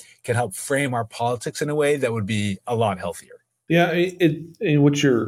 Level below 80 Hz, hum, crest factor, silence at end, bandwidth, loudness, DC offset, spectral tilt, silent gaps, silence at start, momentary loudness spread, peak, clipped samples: -62 dBFS; none; 16 dB; 0 s; 16.5 kHz; -22 LUFS; under 0.1%; -5.5 dB/octave; none; 0.25 s; 8 LU; -6 dBFS; under 0.1%